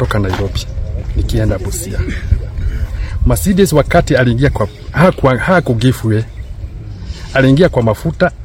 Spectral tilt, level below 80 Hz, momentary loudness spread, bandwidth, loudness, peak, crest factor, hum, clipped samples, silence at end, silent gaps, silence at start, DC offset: -6.5 dB/octave; -22 dBFS; 12 LU; 16.5 kHz; -14 LUFS; 0 dBFS; 14 dB; none; 0.3%; 0 s; none; 0 s; under 0.1%